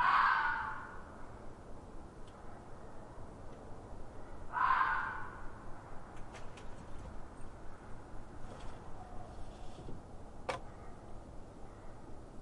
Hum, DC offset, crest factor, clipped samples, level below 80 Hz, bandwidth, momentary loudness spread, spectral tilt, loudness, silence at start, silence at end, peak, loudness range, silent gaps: none; under 0.1%; 22 dB; under 0.1%; -52 dBFS; 11 kHz; 21 LU; -4.5 dB/octave; -37 LUFS; 0 s; 0 s; -18 dBFS; 13 LU; none